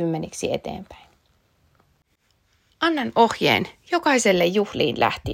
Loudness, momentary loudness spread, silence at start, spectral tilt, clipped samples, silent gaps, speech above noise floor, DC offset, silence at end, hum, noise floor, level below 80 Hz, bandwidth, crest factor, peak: -21 LUFS; 9 LU; 0 s; -4 dB/octave; under 0.1%; none; 45 dB; under 0.1%; 0 s; none; -66 dBFS; -54 dBFS; 16 kHz; 20 dB; -4 dBFS